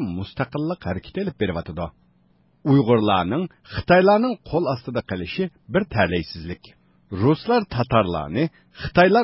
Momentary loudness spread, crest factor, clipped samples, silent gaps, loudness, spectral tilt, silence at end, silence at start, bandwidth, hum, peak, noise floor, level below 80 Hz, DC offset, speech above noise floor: 15 LU; 18 dB; under 0.1%; none; -22 LUFS; -11 dB/octave; 0 s; 0 s; 5.8 kHz; none; -4 dBFS; -60 dBFS; -44 dBFS; under 0.1%; 39 dB